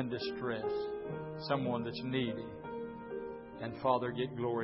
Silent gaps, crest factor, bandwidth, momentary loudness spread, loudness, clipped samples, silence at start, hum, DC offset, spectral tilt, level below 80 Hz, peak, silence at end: none; 20 dB; 5.8 kHz; 10 LU; -38 LUFS; under 0.1%; 0 s; none; under 0.1%; -5 dB/octave; -66 dBFS; -18 dBFS; 0 s